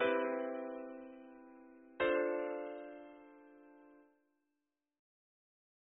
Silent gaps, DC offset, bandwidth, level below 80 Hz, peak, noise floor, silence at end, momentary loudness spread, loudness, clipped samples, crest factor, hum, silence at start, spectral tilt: none; under 0.1%; 3.7 kHz; -80 dBFS; -22 dBFS; -89 dBFS; 2 s; 25 LU; -39 LUFS; under 0.1%; 20 dB; none; 0 s; 1.5 dB/octave